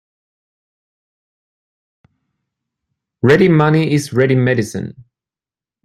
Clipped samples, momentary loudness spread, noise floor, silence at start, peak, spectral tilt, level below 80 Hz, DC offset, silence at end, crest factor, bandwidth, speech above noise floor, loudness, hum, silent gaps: under 0.1%; 14 LU; under -90 dBFS; 3.25 s; 0 dBFS; -7 dB/octave; -54 dBFS; under 0.1%; 0.85 s; 18 dB; 13 kHz; over 77 dB; -14 LUFS; none; none